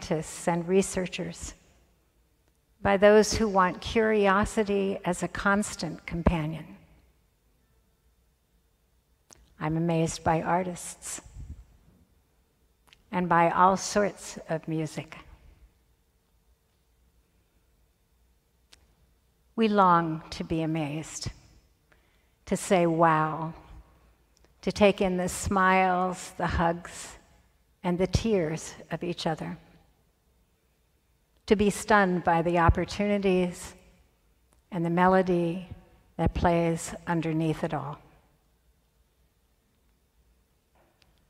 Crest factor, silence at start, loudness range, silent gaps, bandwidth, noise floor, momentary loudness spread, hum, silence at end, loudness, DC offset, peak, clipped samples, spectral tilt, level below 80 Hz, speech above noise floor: 22 dB; 0 s; 9 LU; none; 15 kHz; -69 dBFS; 17 LU; none; 3.3 s; -26 LUFS; under 0.1%; -6 dBFS; under 0.1%; -5.5 dB/octave; -46 dBFS; 43 dB